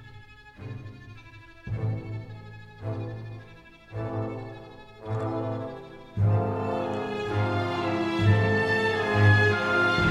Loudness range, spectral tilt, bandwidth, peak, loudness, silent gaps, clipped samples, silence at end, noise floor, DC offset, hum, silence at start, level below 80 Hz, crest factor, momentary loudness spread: 13 LU; -7 dB/octave; 9 kHz; -8 dBFS; -26 LUFS; none; under 0.1%; 0 s; -49 dBFS; under 0.1%; none; 0 s; -52 dBFS; 20 dB; 22 LU